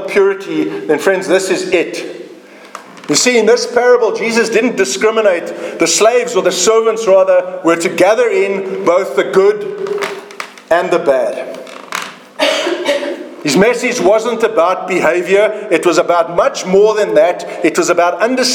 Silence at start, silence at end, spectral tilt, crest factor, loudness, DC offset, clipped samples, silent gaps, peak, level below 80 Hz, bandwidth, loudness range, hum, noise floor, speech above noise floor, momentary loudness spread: 0 s; 0 s; -3 dB/octave; 12 dB; -12 LUFS; under 0.1%; under 0.1%; none; 0 dBFS; -58 dBFS; 18 kHz; 4 LU; none; -36 dBFS; 24 dB; 12 LU